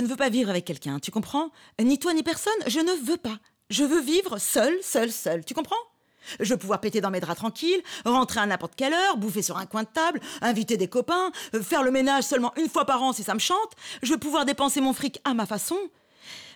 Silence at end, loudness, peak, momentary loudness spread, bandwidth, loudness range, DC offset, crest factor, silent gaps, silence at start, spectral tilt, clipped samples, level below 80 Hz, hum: 0 s; -26 LUFS; -12 dBFS; 8 LU; over 20 kHz; 2 LU; under 0.1%; 14 dB; none; 0 s; -3.5 dB/octave; under 0.1%; -66 dBFS; none